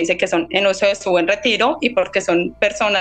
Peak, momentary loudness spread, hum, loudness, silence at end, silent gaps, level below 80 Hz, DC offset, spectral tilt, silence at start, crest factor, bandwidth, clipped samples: 0 dBFS; 3 LU; none; -17 LUFS; 0 s; none; -50 dBFS; under 0.1%; -3.5 dB/octave; 0 s; 16 dB; 9.2 kHz; under 0.1%